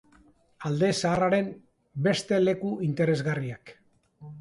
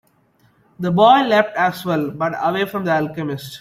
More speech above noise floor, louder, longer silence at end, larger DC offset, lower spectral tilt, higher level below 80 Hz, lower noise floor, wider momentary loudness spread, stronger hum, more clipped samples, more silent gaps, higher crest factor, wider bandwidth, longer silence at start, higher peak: second, 34 dB vs 41 dB; second, -27 LUFS vs -18 LUFS; about the same, 0 s vs 0 s; neither; about the same, -6 dB/octave vs -6 dB/octave; about the same, -60 dBFS vs -60 dBFS; about the same, -60 dBFS vs -58 dBFS; about the same, 13 LU vs 13 LU; neither; neither; neither; about the same, 16 dB vs 16 dB; second, 11.5 kHz vs 16 kHz; second, 0.6 s vs 0.8 s; second, -12 dBFS vs -2 dBFS